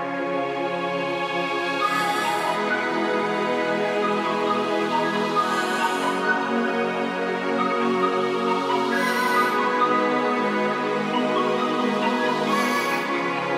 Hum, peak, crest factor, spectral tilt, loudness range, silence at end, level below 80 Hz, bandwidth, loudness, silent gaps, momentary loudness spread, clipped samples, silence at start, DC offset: none; -8 dBFS; 14 dB; -4.5 dB/octave; 2 LU; 0 s; -76 dBFS; 16 kHz; -23 LUFS; none; 4 LU; under 0.1%; 0 s; under 0.1%